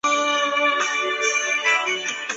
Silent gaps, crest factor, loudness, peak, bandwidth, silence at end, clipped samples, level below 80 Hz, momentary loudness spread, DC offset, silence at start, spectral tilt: none; 14 dB; -20 LUFS; -8 dBFS; 8.2 kHz; 0 s; under 0.1%; -72 dBFS; 3 LU; under 0.1%; 0.05 s; 1 dB/octave